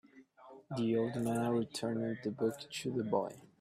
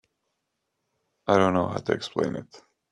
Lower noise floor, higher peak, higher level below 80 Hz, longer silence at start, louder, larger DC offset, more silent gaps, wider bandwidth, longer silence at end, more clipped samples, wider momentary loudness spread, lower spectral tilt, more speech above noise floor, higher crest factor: second, -58 dBFS vs -80 dBFS; second, -18 dBFS vs -4 dBFS; second, -74 dBFS vs -64 dBFS; second, 0.15 s vs 1.25 s; second, -36 LUFS vs -25 LUFS; neither; neither; first, 15 kHz vs 10.5 kHz; second, 0.15 s vs 0.35 s; neither; second, 6 LU vs 13 LU; about the same, -6 dB/octave vs -6 dB/octave; second, 23 dB vs 55 dB; second, 18 dB vs 24 dB